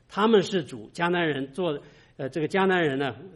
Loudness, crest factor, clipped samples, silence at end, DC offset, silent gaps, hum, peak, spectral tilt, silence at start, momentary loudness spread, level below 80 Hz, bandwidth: -25 LUFS; 18 dB; under 0.1%; 0.05 s; under 0.1%; none; none; -8 dBFS; -6 dB/octave; 0.1 s; 13 LU; -64 dBFS; 11.5 kHz